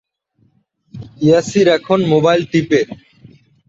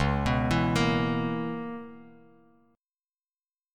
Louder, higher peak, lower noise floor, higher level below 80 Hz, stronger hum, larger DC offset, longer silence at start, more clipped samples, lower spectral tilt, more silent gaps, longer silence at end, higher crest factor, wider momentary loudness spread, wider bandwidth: first, -14 LUFS vs -28 LUFS; first, -2 dBFS vs -12 dBFS; second, -59 dBFS vs under -90 dBFS; second, -54 dBFS vs -42 dBFS; neither; neither; first, 0.95 s vs 0 s; neither; about the same, -6 dB/octave vs -6.5 dB/octave; neither; second, 0.75 s vs 1.65 s; about the same, 14 dB vs 16 dB; first, 21 LU vs 14 LU; second, 8 kHz vs 15 kHz